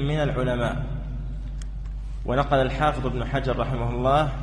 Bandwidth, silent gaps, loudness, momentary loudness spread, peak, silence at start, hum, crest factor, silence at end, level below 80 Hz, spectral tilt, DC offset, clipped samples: 10.5 kHz; none; -26 LUFS; 14 LU; -8 dBFS; 0 s; none; 18 dB; 0 s; -32 dBFS; -7.5 dB/octave; under 0.1%; under 0.1%